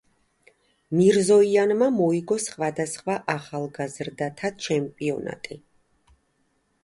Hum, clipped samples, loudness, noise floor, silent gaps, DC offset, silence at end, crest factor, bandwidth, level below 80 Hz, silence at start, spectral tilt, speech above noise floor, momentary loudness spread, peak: none; under 0.1%; -24 LUFS; -69 dBFS; none; under 0.1%; 1.25 s; 18 dB; 11.5 kHz; -66 dBFS; 0.9 s; -5.5 dB/octave; 46 dB; 14 LU; -8 dBFS